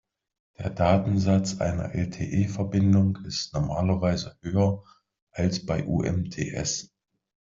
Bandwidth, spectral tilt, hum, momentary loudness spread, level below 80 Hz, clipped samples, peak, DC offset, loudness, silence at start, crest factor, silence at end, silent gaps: 7.6 kHz; -6 dB/octave; none; 9 LU; -50 dBFS; under 0.1%; -8 dBFS; under 0.1%; -26 LUFS; 0.6 s; 18 dB; 0.7 s; 5.22-5.27 s